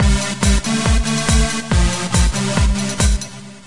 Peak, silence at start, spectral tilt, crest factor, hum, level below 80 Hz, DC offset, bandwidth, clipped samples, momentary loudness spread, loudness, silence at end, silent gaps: -2 dBFS; 0 s; -4 dB/octave; 14 dB; none; -20 dBFS; 2%; 11.5 kHz; under 0.1%; 2 LU; -17 LUFS; 0 s; none